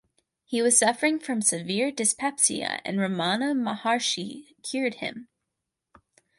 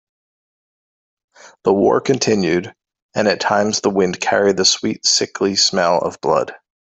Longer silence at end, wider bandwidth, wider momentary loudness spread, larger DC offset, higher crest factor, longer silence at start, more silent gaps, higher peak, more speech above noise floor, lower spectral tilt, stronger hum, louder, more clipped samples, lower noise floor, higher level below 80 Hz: first, 1.15 s vs 0.3 s; first, 12 kHz vs 8.4 kHz; first, 13 LU vs 6 LU; neither; about the same, 20 dB vs 16 dB; second, 0.5 s vs 1.45 s; second, none vs 3.02-3.09 s; second, -8 dBFS vs -2 dBFS; second, 58 dB vs over 74 dB; about the same, -2.5 dB/octave vs -3 dB/octave; neither; second, -25 LUFS vs -16 LUFS; neither; second, -84 dBFS vs under -90 dBFS; second, -74 dBFS vs -58 dBFS